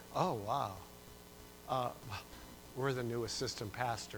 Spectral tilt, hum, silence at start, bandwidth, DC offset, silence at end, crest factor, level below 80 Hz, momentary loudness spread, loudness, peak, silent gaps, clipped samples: -4.5 dB/octave; 60 Hz at -60 dBFS; 0 s; over 20 kHz; under 0.1%; 0 s; 22 dB; -62 dBFS; 17 LU; -39 LUFS; -18 dBFS; none; under 0.1%